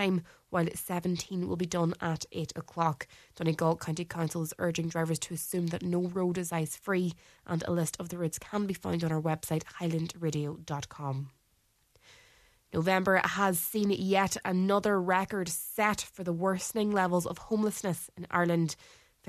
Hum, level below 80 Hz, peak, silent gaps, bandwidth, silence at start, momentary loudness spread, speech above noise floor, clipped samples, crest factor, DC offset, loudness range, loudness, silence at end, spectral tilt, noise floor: none; -64 dBFS; -10 dBFS; none; 14 kHz; 0 s; 9 LU; 40 dB; under 0.1%; 22 dB; under 0.1%; 5 LU; -31 LUFS; 0.45 s; -5 dB/octave; -71 dBFS